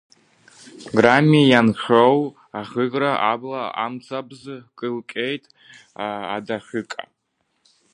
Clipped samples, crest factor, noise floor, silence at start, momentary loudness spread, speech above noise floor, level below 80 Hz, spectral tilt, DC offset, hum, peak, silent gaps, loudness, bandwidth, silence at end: under 0.1%; 22 dB; -72 dBFS; 0.75 s; 19 LU; 52 dB; -64 dBFS; -6.5 dB/octave; under 0.1%; none; 0 dBFS; none; -20 LUFS; 10.5 kHz; 0.9 s